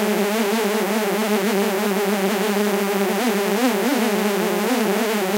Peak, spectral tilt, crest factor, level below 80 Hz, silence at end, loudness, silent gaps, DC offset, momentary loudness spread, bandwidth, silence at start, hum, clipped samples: -4 dBFS; -4 dB/octave; 16 dB; -82 dBFS; 0 s; -20 LUFS; none; under 0.1%; 1 LU; 16 kHz; 0 s; none; under 0.1%